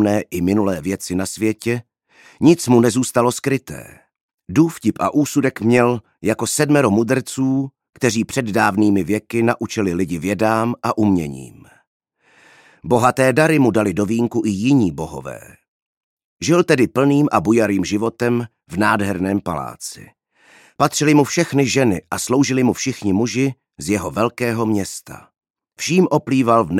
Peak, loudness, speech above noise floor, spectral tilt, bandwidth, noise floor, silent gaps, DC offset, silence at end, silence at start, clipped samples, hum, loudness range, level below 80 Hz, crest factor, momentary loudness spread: -2 dBFS; -18 LUFS; 36 dB; -5.5 dB/octave; 16 kHz; -53 dBFS; 4.21-4.38 s, 11.87-12.00 s, 15.68-16.17 s, 16.24-16.37 s, 25.50-25.54 s; under 0.1%; 0 s; 0 s; under 0.1%; none; 3 LU; -52 dBFS; 16 dB; 10 LU